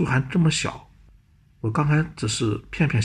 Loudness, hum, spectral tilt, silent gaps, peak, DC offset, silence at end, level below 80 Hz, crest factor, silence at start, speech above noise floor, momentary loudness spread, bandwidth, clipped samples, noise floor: -23 LUFS; none; -5.5 dB/octave; none; -8 dBFS; under 0.1%; 0 s; -46 dBFS; 14 dB; 0 s; 33 dB; 9 LU; 10.5 kHz; under 0.1%; -55 dBFS